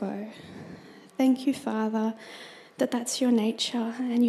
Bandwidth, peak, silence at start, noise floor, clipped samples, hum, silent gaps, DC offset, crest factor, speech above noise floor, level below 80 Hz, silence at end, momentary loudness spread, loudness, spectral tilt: 14 kHz; -12 dBFS; 0 s; -47 dBFS; under 0.1%; none; none; under 0.1%; 16 dB; 21 dB; -76 dBFS; 0 s; 20 LU; -27 LUFS; -4 dB/octave